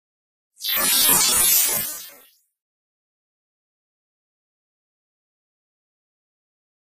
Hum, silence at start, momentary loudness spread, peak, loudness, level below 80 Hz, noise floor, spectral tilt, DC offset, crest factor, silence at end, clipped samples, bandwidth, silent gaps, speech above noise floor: none; 0.6 s; 15 LU; -4 dBFS; -16 LUFS; -58 dBFS; -53 dBFS; 1 dB/octave; under 0.1%; 22 dB; 4.75 s; under 0.1%; 15.5 kHz; none; 34 dB